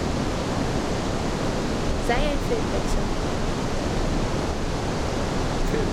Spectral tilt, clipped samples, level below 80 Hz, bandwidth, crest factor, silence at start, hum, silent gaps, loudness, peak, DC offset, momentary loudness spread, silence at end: -5.5 dB/octave; under 0.1%; -30 dBFS; 13.5 kHz; 14 dB; 0 s; none; none; -26 LUFS; -10 dBFS; under 0.1%; 3 LU; 0 s